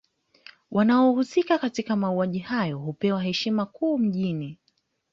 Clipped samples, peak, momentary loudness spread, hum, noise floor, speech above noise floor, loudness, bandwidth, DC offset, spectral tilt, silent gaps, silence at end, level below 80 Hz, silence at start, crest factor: under 0.1%; -10 dBFS; 9 LU; none; -71 dBFS; 47 dB; -25 LUFS; 7.6 kHz; under 0.1%; -6.5 dB/octave; none; 0.6 s; -66 dBFS; 0.7 s; 16 dB